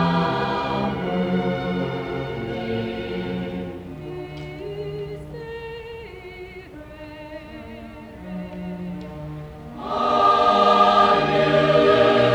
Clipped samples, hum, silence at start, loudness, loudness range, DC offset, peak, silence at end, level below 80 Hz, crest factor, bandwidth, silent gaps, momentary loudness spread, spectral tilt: under 0.1%; none; 0 s; -20 LUFS; 18 LU; under 0.1%; -4 dBFS; 0 s; -46 dBFS; 18 dB; 11 kHz; none; 22 LU; -6.5 dB/octave